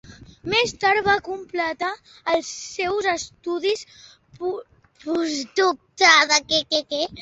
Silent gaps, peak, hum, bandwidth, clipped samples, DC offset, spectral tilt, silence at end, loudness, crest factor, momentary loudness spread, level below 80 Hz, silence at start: none; -2 dBFS; none; 8.2 kHz; under 0.1%; under 0.1%; -1.5 dB/octave; 0 s; -21 LUFS; 22 dB; 14 LU; -56 dBFS; 0.05 s